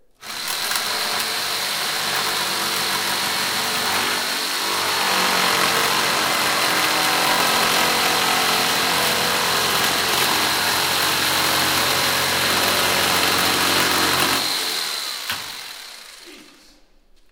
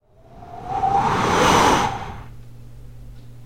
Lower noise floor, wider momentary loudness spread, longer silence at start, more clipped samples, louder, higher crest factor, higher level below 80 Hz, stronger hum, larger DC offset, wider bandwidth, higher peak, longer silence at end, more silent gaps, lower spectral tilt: first, -52 dBFS vs -44 dBFS; second, 6 LU vs 22 LU; second, 0.2 s vs 0.35 s; neither; about the same, -18 LUFS vs -18 LUFS; about the same, 20 dB vs 20 dB; second, -60 dBFS vs -40 dBFS; neither; second, under 0.1% vs 0.7%; first, 19 kHz vs 16.5 kHz; about the same, 0 dBFS vs -2 dBFS; first, 0.9 s vs 0 s; neither; second, -1 dB/octave vs -4 dB/octave